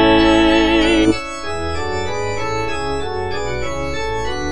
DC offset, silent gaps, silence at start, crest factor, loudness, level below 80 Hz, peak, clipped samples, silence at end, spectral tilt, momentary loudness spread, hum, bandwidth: 5%; none; 0 s; 16 dB; -18 LUFS; -32 dBFS; -2 dBFS; under 0.1%; 0 s; -5 dB/octave; 11 LU; none; 10.5 kHz